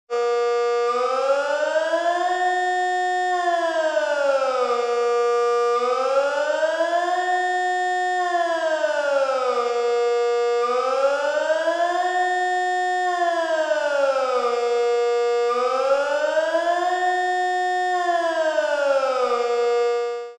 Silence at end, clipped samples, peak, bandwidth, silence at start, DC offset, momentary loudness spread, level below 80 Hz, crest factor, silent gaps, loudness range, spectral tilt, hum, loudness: 0.05 s; under 0.1%; -8 dBFS; 9.8 kHz; 0.1 s; under 0.1%; 1 LU; -84 dBFS; 12 dB; none; 1 LU; 0 dB/octave; none; -21 LUFS